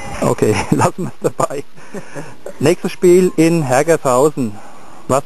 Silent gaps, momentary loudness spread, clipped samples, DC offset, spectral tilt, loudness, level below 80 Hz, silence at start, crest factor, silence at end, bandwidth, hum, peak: none; 20 LU; under 0.1%; 4%; -6 dB/octave; -15 LUFS; -46 dBFS; 0 s; 16 dB; 0.05 s; 13.5 kHz; none; 0 dBFS